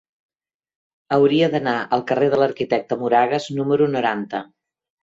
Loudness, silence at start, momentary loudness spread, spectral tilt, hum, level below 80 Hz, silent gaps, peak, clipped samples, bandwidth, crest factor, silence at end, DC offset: -19 LUFS; 1.1 s; 6 LU; -6.5 dB/octave; none; -64 dBFS; none; -4 dBFS; under 0.1%; 7.8 kHz; 16 dB; 0.6 s; under 0.1%